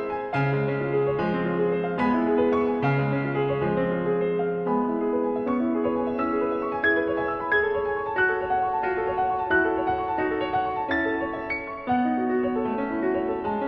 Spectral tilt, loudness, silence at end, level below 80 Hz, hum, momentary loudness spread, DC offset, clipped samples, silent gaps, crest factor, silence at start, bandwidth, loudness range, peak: -9 dB/octave; -25 LUFS; 0 s; -54 dBFS; none; 4 LU; under 0.1%; under 0.1%; none; 14 dB; 0 s; 5.8 kHz; 1 LU; -10 dBFS